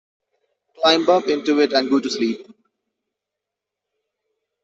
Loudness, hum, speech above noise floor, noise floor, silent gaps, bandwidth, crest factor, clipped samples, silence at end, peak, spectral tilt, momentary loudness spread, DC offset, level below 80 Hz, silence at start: -18 LUFS; 50 Hz at -65 dBFS; 66 dB; -84 dBFS; none; 8 kHz; 20 dB; under 0.1%; 2.2 s; -4 dBFS; -3.5 dB/octave; 7 LU; under 0.1%; -68 dBFS; 0.8 s